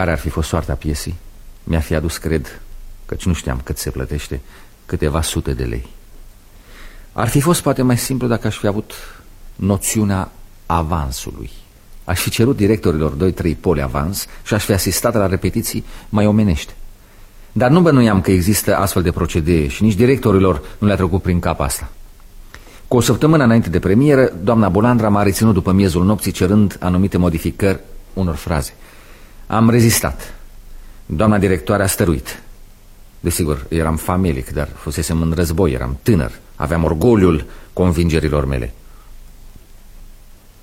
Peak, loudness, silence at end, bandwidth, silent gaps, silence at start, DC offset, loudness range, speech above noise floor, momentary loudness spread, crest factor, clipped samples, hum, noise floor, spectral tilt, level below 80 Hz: 0 dBFS; -16 LUFS; 0.5 s; 16.5 kHz; none; 0 s; under 0.1%; 8 LU; 25 dB; 13 LU; 16 dB; under 0.1%; none; -41 dBFS; -6 dB/octave; -30 dBFS